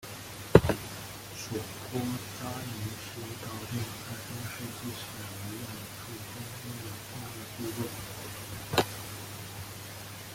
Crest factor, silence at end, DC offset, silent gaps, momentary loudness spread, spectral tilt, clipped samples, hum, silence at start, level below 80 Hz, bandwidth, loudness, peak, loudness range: 32 dB; 0 s; under 0.1%; none; 11 LU; -5 dB/octave; under 0.1%; none; 0 s; -52 dBFS; 17 kHz; -35 LUFS; -2 dBFS; 8 LU